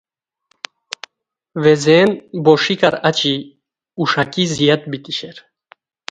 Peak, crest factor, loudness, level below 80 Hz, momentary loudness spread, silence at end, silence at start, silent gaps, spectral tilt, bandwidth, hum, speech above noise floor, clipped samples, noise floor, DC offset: 0 dBFS; 18 dB; -15 LUFS; -58 dBFS; 21 LU; 0.7 s; 1.55 s; none; -5 dB/octave; 9.2 kHz; none; 57 dB; under 0.1%; -73 dBFS; under 0.1%